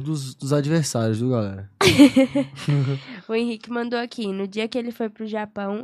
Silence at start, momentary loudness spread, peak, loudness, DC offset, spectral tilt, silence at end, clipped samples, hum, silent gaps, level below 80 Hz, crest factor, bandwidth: 0 s; 14 LU; 0 dBFS; -22 LUFS; under 0.1%; -5.5 dB/octave; 0 s; under 0.1%; none; none; -56 dBFS; 20 dB; 14 kHz